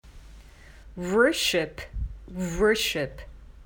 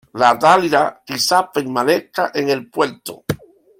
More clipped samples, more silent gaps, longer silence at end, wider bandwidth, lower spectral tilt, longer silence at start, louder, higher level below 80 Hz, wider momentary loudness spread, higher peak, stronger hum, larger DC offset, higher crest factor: neither; neither; second, 0 s vs 0.45 s; first, 19.5 kHz vs 16.5 kHz; about the same, -3.5 dB/octave vs -3.5 dB/octave; about the same, 0.05 s vs 0.15 s; second, -25 LUFS vs -17 LUFS; first, -42 dBFS vs -56 dBFS; about the same, 16 LU vs 14 LU; second, -8 dBFS vs 0 dBFS; neither; neither; about the same, 20 dB vs 18 dB